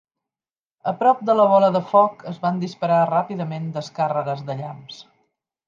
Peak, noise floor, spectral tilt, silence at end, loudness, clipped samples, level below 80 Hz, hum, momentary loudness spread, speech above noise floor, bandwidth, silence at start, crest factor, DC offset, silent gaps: -2 dBFS; under -90 dBFS; -7.5 dB/octave; 0.65 s; -20 LUFS; under 0.1%; -72 dBFS; none; 15 LU; over 70 dB; 7.6 kHz; 0.85 s; 18 dB; under 0.1%; none